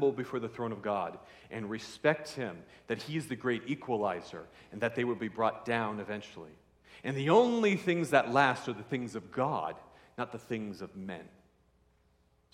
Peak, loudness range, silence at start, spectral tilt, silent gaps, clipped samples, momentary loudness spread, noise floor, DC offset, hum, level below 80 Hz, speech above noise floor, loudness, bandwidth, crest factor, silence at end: -10 dBFS; 8 LU; 0 s; -6 dB/octave; none; under 0.1%; 17 LU; -69 dBFS; under 0.1%; none; -72 dBFS; 37 dB; -33 LUFS; 15 kHz; 24 dB; 1.25 s